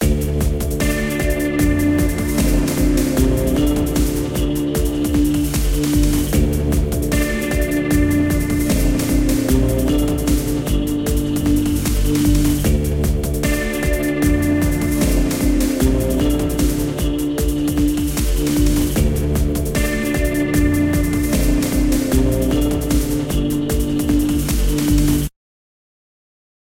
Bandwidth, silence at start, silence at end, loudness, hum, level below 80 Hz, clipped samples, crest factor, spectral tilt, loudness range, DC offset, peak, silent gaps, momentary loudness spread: 17 kHz; 0 s; 1.5 s; -18 LUFS; none; -22 dBFS; under 0.1%; 14 dB; -5.5 dB/octave; 1 LU; under 0.1%; -2 dBFS; none; 3 LU